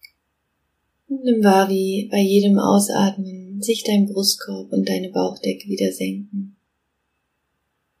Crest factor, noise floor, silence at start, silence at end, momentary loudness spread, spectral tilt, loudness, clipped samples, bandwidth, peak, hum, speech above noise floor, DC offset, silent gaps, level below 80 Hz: 18 dB; -73 dBFS; 1.1 s; 1.5 s; 14 LU; -5 dB/octave; -19 LUFS; under 0.1%; 15.5 kHz; -2 dBFS; none; 54 dB; under 0.1%; none; -70 dBFS